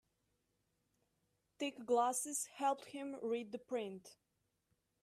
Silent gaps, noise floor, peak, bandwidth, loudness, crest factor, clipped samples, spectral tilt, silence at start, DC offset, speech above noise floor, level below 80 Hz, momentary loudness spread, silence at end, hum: none; -83 dBFS; -24 dBFS; 15.5 kHz; -40 LUFS; 20 dB; under 0.1%; -2.5 dB/octave; 1.6 s; under 0.1%; 43 dB; -88 dBFS; 11 LU; 0.9 s; none